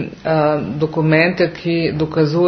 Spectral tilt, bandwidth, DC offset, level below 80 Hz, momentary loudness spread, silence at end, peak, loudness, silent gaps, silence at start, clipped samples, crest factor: -8 dB/octave; 6.4 kHz; under 0.1%; -48 dBFS; 5 LU; 0 s; 0 dBFS; -17 LUFS; none; 0 s; under 0.1%; 16 dB